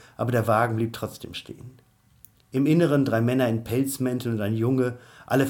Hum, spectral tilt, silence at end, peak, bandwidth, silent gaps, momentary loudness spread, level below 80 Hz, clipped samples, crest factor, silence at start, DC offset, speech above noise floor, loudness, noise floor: none; -6.5 dB/octave; 0 s; -8 dBFS; 18.5 kHz; none; 16 LU; -60 dBFS; under 0.1%; 18 dB; 0.2 s; under 0.1%; 32 dB; -24 LUFS; -56 dBFS